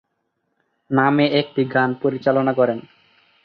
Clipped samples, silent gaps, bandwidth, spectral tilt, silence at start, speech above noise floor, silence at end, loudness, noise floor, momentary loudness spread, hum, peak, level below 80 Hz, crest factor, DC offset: under 0.1%; none; 5.4 kHz; -9 dB/octave; 0.9 s; 54 dB; 0.65 s; -19 LUFS; -73 dBFS; 5 LU; none; -2 dBFS; -64 dBFS; 18 dB; under 0.1%